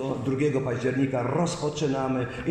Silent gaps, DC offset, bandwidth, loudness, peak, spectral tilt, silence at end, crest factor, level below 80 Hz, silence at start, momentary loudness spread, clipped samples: none; under 0.1%; 10.5 kHz; -27 LUFS; -14 dBFS; -6.5 dB/octave; 0 s; 12 dB; -52 dBFS; 0 s; 3 LU; under 0.1%